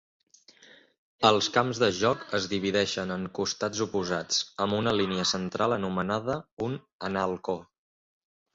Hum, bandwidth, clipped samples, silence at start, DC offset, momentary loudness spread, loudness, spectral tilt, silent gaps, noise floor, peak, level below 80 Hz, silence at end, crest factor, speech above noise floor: none; 8 kHz; under 0.1%; 1.2 s; under 0.1%; 9 LU; -28 LUFS; -4 dB/octave; 6.52-6.57 s, 6.93-6.99 s; -56 dBFS; -6 dBFS; -60 dBFS; 0.9 s; 22 dB; 28 dB